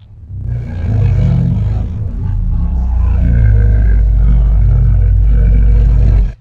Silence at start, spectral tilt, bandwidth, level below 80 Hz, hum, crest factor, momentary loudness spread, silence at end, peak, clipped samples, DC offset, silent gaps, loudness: 0.2 s; -10.5 dB/octave; 2.7 kHz; -10 dBFS; none; 10 dB; 8 LU; 0.05 s; 0 dBFS; under 0.1%; under 0.1%; none; -13 LUFS